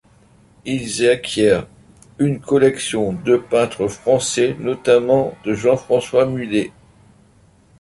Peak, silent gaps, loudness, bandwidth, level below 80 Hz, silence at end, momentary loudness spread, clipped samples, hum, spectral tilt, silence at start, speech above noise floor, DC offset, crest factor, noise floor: -2 dBFS; none; -18 LUFS; 11.5 kHz; -50 dBFS; 1.1 s; 7 LU; under 0.1%; none; -5 dB/octave; 0.65 s; 35 dB; under 0.1%; 16 dB; -52 dBFS